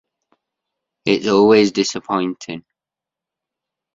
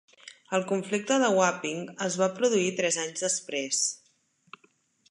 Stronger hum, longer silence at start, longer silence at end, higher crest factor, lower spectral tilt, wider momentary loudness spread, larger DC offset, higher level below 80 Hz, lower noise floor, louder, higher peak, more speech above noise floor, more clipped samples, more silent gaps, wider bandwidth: neither; first, 1.05 s vs 0.25 s; first, 1.35 s vs 1.15 s; about the same, 18 dB vs 20 dB; first, -4.5 dB/octave vs -3 dB/octave; first, 18 LU vs 8 LU; neither; first, -60 dBFS vs -82 dBFS; first, -87 dBFS vs -68 dBFS; first, -16 LUFS vs -27 LUFS; first, -2 dBFS vs -10 dBFS; first, 71 dB vs 40 dB; neither; neither; second, 7.8 kHz vs 11.5 kHz